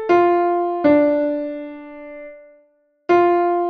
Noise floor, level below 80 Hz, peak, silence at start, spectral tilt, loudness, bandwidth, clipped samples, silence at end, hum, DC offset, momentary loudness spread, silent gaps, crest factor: -59 dBFS; -58 dBFS; -4 dBFS; 0 s; -7.5 dB/octave; -17 LUFS; 6.2 kHz; under 0.1%; 0 s; none; under 0.1%; 21 LU; none; 14 dB